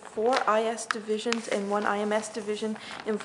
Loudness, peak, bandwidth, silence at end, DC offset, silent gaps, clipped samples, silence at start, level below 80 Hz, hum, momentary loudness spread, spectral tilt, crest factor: -28 LUFS; -6 dBFS; 11 kHz; 0 s; under 0.1%; none; under 0.1%; 0 s; -74 dBFS; none; 8 LU; -3.5 dB/octave; 22 dB